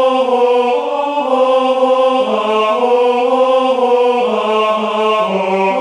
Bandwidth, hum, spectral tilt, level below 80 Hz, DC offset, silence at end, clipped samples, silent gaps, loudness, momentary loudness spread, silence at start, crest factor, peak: 10.5 kHz; none; -5 dB/octave; -64 dBFS; under 0.1%; 0 s; under 0.1%; none; -13 LUFS; 3 LU; 0 s; 12 dB; 0 dBFS